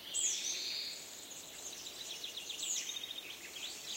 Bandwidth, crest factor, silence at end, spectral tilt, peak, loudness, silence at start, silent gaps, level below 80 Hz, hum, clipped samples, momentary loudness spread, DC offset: 16 kHz; 20 dB; 0 s; 2 dB/octave; -22 dBFS; -39 LUFS; 0 s; none; -78 dBFS; none; under 0.1%; 12 LU; under 0.1%